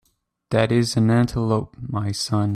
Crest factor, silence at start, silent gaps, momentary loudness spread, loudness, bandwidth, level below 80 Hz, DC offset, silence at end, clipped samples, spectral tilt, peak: 14 dB; 0.5 s; none; 8 LU; -21 LUFS; 13.5 kHz; -46 dBFS; under 0.1%; 0 s; under 0.1%; -6 dB/octave; -6 dBFS